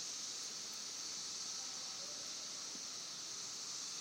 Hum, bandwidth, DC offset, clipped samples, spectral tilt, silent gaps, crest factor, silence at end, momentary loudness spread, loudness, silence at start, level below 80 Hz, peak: none; 16 kHz; under 0.1%; under 0.1%; 1 dB/octave; none; 14 dB; 0 s; 2 LU; -43 LUFS; 0 s; -88 dBFS; -32 dBFS